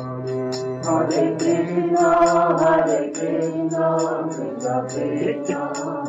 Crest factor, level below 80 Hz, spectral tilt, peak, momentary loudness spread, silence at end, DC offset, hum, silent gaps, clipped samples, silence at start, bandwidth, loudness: 14 dB; -56 dBFS; -6 dB/octave; -6 dBFS; 9 LU; 0 s; under 0.1%; none; none; under 0.1%; 0 s; 8.2 kHz; -21 LUFS